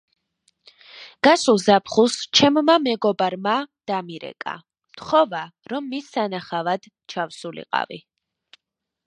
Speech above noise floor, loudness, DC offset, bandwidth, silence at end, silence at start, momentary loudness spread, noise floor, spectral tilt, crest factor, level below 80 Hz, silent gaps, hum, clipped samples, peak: 57 dB; -21 LUFS; under 0.1%; 11 kHz; 1.1 s; 0.95 s; 17 LU; -78 dBFS; -3.5 dB/octave; 20 dB; -64 dBFS; none; none; under 0.1%; -2 dBFS